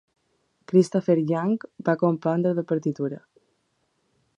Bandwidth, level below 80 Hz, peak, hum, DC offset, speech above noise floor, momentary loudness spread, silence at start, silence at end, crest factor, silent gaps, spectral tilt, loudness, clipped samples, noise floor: 11 kHz; -74 dBFS; -6 dBFS; none; under 0.1%; 49 dB; 8 LU; 0.7 s; 1.2 s; 20 dB; none; -8 dB/octave; -24 LUFS; under 0.1%; -72 dBFS